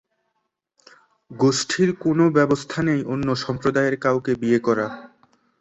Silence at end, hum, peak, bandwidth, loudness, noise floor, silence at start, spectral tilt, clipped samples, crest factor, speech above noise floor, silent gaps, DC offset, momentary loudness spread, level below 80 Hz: 0.55 s; none; -4 dBFS; 8.4 kHz; -21 LUFS; -75 dBFS; 1.3 s; -5.5 dB/octave; under 0.1%; 18 dB; 55 dB; none; under 0.1%; 6 LU; -56 dBFS